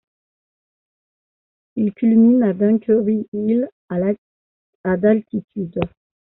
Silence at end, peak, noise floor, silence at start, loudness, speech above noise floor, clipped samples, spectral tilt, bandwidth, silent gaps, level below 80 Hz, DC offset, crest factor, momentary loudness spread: 0.45 s; -4 dBFS; under -90 dBFS; 1.75 s; -19 LUFS; over 73 dB; under 0.1%; -9 dB/octave; 3.7 kHz; 3.28-3.32 s, 3.72-3.88 s, 4.18-4.84 s, 5.44-5.48 s; -54 dBFS; under 0.1%; 16 dB; 14 LU